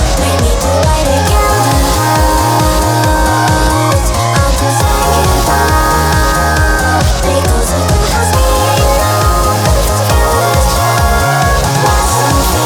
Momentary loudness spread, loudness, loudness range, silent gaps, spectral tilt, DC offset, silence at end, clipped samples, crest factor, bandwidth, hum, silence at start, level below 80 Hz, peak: 1 LU; -10 LUFS; 0 LU; none; -4.5 dB/octave; under 0.1%; 0 s; under 0.1%; 10 dB; 19.5 kHz; none; 0 s; -16 dBFS; 0 dBFS